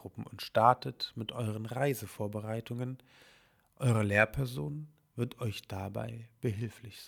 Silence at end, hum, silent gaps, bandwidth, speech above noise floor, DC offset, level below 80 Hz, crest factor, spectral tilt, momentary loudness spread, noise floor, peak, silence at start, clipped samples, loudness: 0 s; none; none; 19.5 kHz; 32 dB; under 0.1%; -60 dBFS; 26 dB; -6 dB/octave; 15 LU; -66 dBFS; -8 dBFS; 0 s; under 0.1%; -34 LUFS